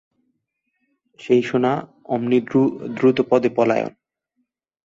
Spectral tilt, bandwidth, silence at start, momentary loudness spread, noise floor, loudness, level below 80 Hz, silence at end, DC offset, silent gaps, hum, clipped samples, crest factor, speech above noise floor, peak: -7.5 dB/octave; 7.6 kHz; 1.2 s; 9 LU; -75 dBFS; -20 LUFS; -64 dBFS; 0.95 s; under 0.1%; none; none; under 0.1%; 18 dB; 56 dB; -4 dBFS